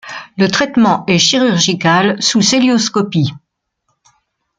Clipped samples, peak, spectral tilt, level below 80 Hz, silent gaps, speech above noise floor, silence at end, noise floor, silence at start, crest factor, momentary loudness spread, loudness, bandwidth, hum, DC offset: under 0.1%; 0 dBFS; -4 dB/octave; -54 dBFS; none; 55 dB; 1.2 s; -67 dBFS; 0.05 s; 14 dB; 6 LU; -12 LUFS; 9.6 kHz; none; under 0.1%